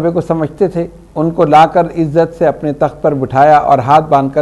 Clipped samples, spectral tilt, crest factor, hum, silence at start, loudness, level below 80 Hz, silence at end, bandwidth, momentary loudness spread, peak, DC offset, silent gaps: 0.4%; -8 dB/octave; 10 dB; none; 0 s; -11 LUFS; -40 dBFS; 0 s; 11.5 kHz; 9 LU; 0 dBFS; under 0.1%; none